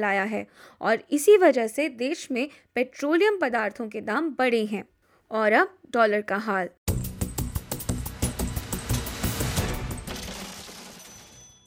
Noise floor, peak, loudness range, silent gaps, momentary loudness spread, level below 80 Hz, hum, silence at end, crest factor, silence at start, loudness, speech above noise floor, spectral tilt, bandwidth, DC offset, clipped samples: -50 dBFS; -6 dBFS; 7 LU; 6.78-6.86 s; 14 LU; -42 dBFS; none; 0.2 s; 20 dB; 0 s; -26 LUFS; 26 dB; -5 dB/octave; 18 kHz; under 0.1%; under 0.1%